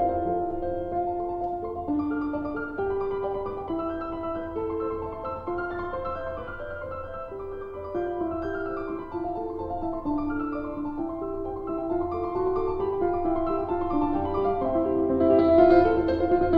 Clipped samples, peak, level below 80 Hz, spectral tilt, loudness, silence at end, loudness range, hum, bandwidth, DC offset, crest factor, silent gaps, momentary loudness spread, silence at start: under 0.1%; -6 dBFS; -44 dBFS; -9.5 dB/octave; -27 LUFS; 0 s; 10 LU; none; 5 kHz; under 0.1%; 20 dB; none; 10 LU; 0 s